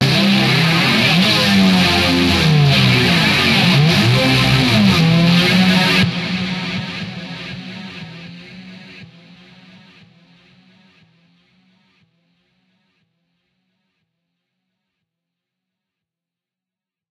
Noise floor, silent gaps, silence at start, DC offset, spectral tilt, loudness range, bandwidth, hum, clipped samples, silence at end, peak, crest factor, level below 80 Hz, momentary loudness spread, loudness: -89 dBFS; none; 0 s; under 0.1%; -5 dB/octave; 19 LU; 14.5 kHz; none; under 0.1%; 8.05 s; 0 dBFS; 16 dB; -42 dBFS; 17 LU; -12 LUFS